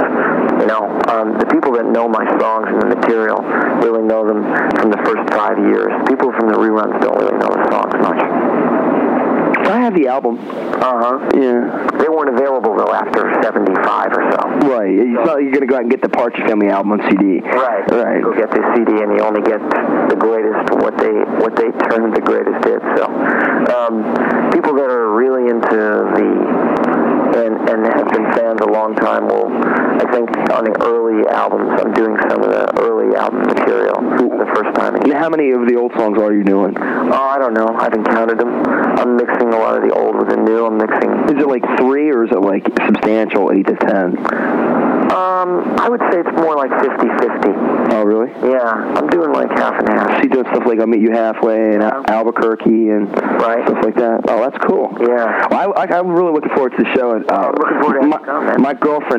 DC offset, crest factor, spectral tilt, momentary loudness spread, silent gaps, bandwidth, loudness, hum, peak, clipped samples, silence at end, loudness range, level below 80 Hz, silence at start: under 0.1%; 12 dB; -7.5 dB/octave; 2 LU; none; 8.6 kHz; -14 LUFS; none; 0 dBFS; under 0.1%; 0 s; 1 LU; -58 dBFS; 0 s